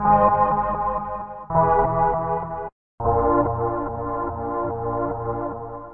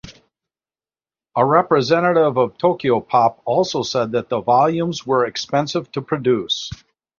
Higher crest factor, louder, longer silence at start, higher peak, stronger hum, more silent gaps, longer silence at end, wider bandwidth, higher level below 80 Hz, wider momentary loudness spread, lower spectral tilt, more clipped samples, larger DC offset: about the same, 18 dB vs 18 dB; second, -23 LUFS vs -18 LUFS; about the same, 0 s vs 0.05 s; second, -4 dBFS vs 0 dBFS; neither; first, 2.72-2.98 s vs none; second, 0 s vs 0.45 s; second, 3.3 kHz vs 7.4 kHz; first, -40 dBFS vs -56 dBFS; first, 13 LU vs 8 LU; first, -13 dB/octave vs -5.5 dB/octave; neither; first, 0.4% vs under 0.1%